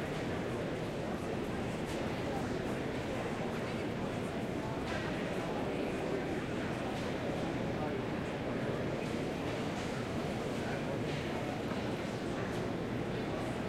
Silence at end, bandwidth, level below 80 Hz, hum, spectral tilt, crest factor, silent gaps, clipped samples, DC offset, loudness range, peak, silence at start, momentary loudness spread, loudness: 0 s; 16.5 kHz; -54 dBFS; none; -6 dB/octave; 14 dB; none; under 0.1%; under 0.1%; 1 LU; -24 dBFS; 0 s; 1 LU; -37 LUFS